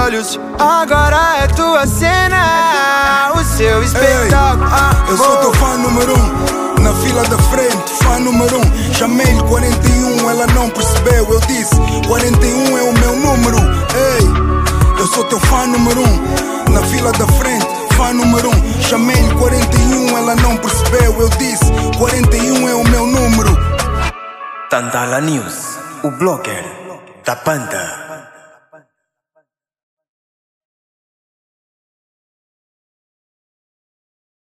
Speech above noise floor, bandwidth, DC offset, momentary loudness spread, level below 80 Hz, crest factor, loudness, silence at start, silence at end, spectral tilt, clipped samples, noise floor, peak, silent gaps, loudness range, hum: 60 dB; 16 kHz; under 0.1%; 7 LU; -18 dBFS; 12 dB; -12 LUFS; 0 s; 6.35 s; -4.5 dB/octave; under 0.1%; -71 dBFS; 0 dBFS; none; 8 LU; none